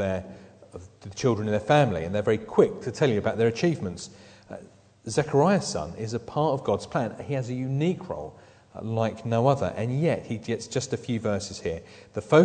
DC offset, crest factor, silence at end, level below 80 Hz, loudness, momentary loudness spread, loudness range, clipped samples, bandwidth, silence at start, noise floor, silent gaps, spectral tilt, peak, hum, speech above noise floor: under 0.1%; 20 dB; 0 s; -56 dBFS; -26 LUFS; 20 LU; 4 LU; under 0.1%; 9.4 kHz; 0 s; -47 dBFS; none; -6 dB/octave; -6 dBFS; none; 21 dB